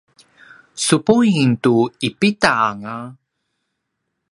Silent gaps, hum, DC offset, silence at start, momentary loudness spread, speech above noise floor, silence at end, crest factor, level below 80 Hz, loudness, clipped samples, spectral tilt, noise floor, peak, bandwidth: none; none; under 0.1%; 0.75 s; 16 LU; 59 dB; 1.2 s; 18 dB; -58 dBFS; -16 LUFS; under 0.1%; -5 dB/octave; -75 dBFS; 0 dBFS; 11.5 kHz